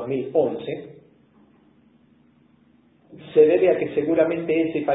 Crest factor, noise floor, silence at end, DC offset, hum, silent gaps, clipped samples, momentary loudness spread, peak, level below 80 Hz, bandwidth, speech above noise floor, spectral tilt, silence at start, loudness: 18 dB; -58 dBFS; 0 s; under 0.1%; none; none; under 0.1%; 13 LU; -4 dBFS; -62 dBFS; 4 kHz; 37 dB; -11 dB/octave; 0 s; -21 LUFS